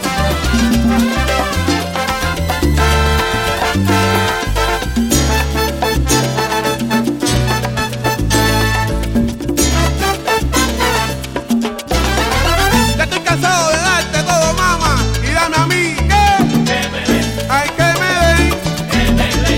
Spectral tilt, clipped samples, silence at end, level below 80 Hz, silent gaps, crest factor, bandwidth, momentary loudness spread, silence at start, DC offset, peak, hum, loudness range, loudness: -4 dB/octave; under 0.1%; 0 s; -22 dBFS; none; 12 dB; 17 kHz; 5 LU; 0 s; under 0.1%; -2 dBFS; none; 2 LU; -14 LUFS